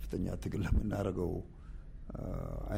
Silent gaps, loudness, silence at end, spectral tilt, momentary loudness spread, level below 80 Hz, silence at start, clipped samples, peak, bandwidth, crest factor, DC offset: none; -38 LUFS; 0 s; -8 dB/octave; 17 LU; -42 dBFS; 0 s; under 0.1%; -18 dBFS; 16 kHz; 18 dB; under 0.1%